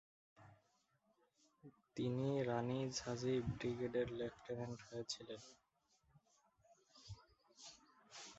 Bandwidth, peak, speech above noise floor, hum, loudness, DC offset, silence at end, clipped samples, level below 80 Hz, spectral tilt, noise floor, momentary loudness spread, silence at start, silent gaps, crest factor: 8 kHz; -26 dBFS; 37 dB; none; -44 LUFS; under 0.1%; 0 s; under 0.1%; -70 dBFS; -6 dB/octave; -80 dBFS; 19 LU; 0.4 s; none; 20 dB